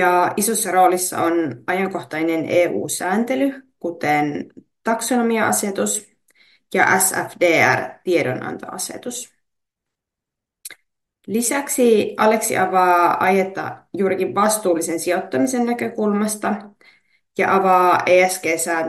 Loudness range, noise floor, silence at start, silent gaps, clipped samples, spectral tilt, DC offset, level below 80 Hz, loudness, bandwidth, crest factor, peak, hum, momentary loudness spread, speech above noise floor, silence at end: 5 LU; -84 dBFS; 0 s; none; under 0.1%; -3.5 dB/octave; under 0.1%; -68 dBFS; -18 LUFS; 13 kHz; 18 dB; -2 dBFS; none; 14 LU; 66 dB; 0 s